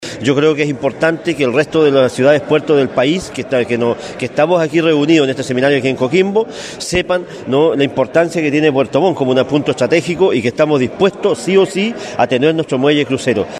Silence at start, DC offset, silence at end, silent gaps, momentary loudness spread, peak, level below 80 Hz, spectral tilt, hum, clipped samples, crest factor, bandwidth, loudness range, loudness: 0 s; under 0.1%; 0 s; none; 6 LU; 0 dBFS; -48 dBFS; -5.5 dB/octave; none; under 0.1%; 14 dB; 12.5 kHz; 1 LU; -14 LUFS